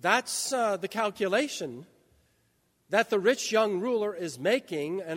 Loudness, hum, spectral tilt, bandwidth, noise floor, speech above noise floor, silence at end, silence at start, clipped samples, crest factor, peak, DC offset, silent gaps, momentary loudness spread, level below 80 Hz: -28 LUFS; none; -3 dB/octave; 16 kHz; -71 dBFS; 43 dB; 0 s; 0.05 s; under 0.1%; 20 dB; -8 dBFS; under 0.1%; none; 8 LU; -76 dBFS